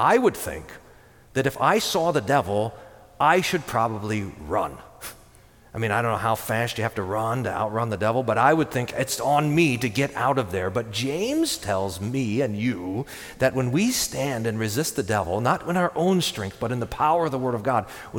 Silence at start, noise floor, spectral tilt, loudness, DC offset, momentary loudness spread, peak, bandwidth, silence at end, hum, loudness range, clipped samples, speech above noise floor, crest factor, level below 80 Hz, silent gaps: 0 s; -52 dBFS; -5 dB/octave; -24 LUFS; under 0.1%; 9 LU; -4 dBFS; 19 kHz; 0 s; none; 4 LU; under 0.1%; 28 dB; 20 dB; -52 dBFS; none